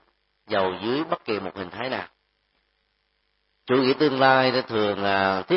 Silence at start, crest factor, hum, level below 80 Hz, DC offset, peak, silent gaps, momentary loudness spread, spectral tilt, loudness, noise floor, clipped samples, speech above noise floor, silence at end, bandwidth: 0.5 s; 22 dB; 50 Hz at -65 dBFS; -66 dBFS; under 0.1%; -2 dBFS; none; 13 LU; -9.5 dB/octave; -23 LUFS; -72 dBFS; under 0.1%; 49 dB; 0 s; 5.8 kHz